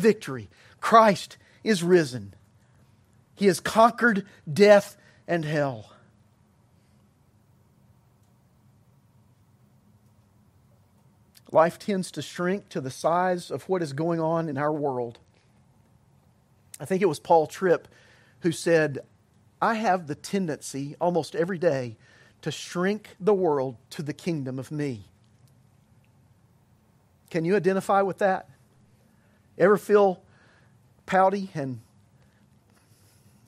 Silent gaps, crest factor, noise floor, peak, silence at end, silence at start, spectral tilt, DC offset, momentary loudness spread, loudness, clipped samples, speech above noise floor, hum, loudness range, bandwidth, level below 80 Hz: none; 24 dB; -62 dBFS; -4 dBFS; 1.65 s; 0 s; -5.5 dB/octave; under 0.1%; 15 LU; -25 LUFS; under 0.1%; 38 dB; none; 8 LU; 15.5 kHz; -70 dBFS